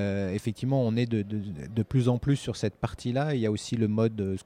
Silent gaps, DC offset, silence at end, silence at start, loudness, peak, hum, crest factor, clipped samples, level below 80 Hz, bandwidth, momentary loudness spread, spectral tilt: none; under 0.1%; 0.05 s; 0 s; -28 LUFS; -12 dBFS; none; 16 dB; under 0.1%; -52 dBFS; 11 kHz; 7 LU; -7 dB/octave